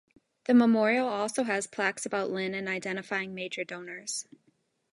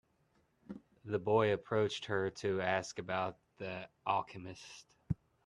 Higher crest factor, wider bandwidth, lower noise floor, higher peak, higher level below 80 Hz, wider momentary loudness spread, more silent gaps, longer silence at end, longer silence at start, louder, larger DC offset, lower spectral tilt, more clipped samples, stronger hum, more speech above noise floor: about the same, 18 dB vs 20 dB; about the same, 11.5 kHz vs 11 kHz; second, -71 dBFS vs -75 dBFS; first, -12 dBFS vs -18 dBFS; second, -78 dBFS vs -66 dBFS; second, 13 LU vs 20 LU; neither; first, 0.7 s vs 0.3 s; second, 0.5 s vs 0.7 s; first, -29 LUFS vs -36 LUFS; neither; second, -4 dB/octave vs -5.5 dB/octave; neither; neither; first, 42 dB vs 38 dB